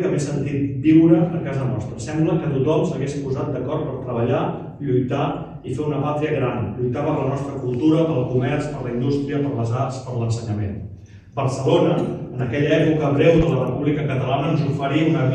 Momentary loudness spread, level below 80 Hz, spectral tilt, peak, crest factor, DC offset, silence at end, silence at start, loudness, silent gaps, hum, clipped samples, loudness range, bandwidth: 10 LU; -44 dBFS; -8 dB/octave; -2 dBFS; 18 dB; under 0.1%; 0 s; 0 s; -21 LUFS; none; none; under 0.1%; 4 LU; 9.6 kHz